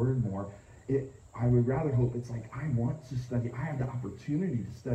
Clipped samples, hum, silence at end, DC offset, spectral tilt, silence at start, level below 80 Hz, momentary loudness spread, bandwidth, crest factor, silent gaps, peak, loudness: under 0.1%; none; 0 s; under 0.1%; -9.5 dB/octave; 0 s; -52 dBFS; 11 LU; 8.4 kHz; 16 dB; none; -16 dBFS; -32 LUFS